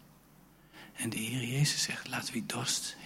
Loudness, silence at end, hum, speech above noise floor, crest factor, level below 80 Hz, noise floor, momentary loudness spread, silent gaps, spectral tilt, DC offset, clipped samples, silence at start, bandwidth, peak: -33 LUFS; 0 s; none; 26 dB; 18 dB; -68 dBFS; -60 dBFS; 9 LU; none; -3 dB/octave; under 0.1%; under 0.1%; 0 s; 16.5 kHz; -18 dBFS